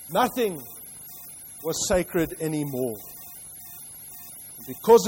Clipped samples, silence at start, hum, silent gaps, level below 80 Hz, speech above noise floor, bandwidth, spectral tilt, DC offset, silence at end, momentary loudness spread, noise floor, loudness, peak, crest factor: under 0.1%; 0 s; none; none; -50 dBFS; 19 dB; 16.5 kHz; -4 dB/octave; under 0.1%; 0 s; 15 LU; -42 dBFS; -26 LUFS; -4 dBFS; 22 dB